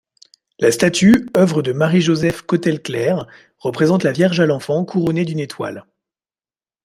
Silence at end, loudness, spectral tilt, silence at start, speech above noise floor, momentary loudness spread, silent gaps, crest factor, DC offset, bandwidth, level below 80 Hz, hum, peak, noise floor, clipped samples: 1.05 s; -17 LUFS; -6 dB/octave; 0.6 s; over 74 dB; 12 LU; none; 16 dB; under 0.1%; 15 kHz; -52 dBFS; none; 0 dBFS; under -90 dBFS; under 0.1%